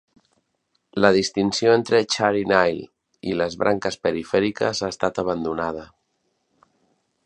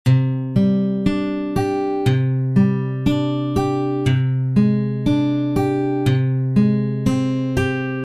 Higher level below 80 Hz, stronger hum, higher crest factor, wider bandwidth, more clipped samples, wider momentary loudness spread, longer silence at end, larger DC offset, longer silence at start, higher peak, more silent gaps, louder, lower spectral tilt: second, -56 dBFS vs -42 dBFS; neither; first, 22 dB vs 14 dB; second, 11 kHz vs 12.5 kHz; neither; first, 10 LU vs 4 LU; first, 1.4 s vs 0 s; neither; first, 0.95 s vs 0.05 s; about the same, -2 dBFS vs -4 dBFS; neither; about the same, -21 LUFS vs -19 LUFS; second, -4.5 dB/octave vs -8 dB/octave